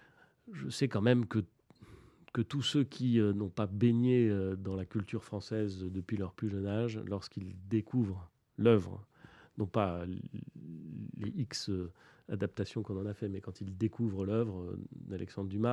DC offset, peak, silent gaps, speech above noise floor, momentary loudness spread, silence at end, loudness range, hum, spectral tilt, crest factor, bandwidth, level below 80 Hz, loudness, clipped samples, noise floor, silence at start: under 0.1%; -12 dBFS; none; 24 dB; 16 LU; 0 s; 7 LU; none; -7 dB/octave; 22 dB; 11 kHz; -66 dBFS; -35 LUFS; under 0.1%; -58 dBFS; 0.45 s